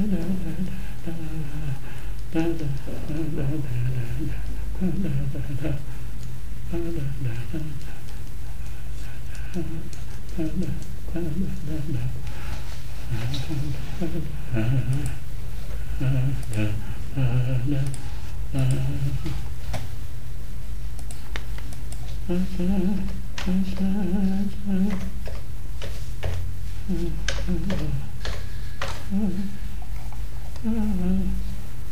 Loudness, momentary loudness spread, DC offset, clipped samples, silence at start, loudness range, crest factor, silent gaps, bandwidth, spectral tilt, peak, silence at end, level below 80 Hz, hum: -30 LUFS; 12 LU; 10%; under 0.1%; 0 s; 7 LU; 18 dB; none; 16 kHz; -7 dB/octave; -6 dBFS; 0 s; -34 dBFS; none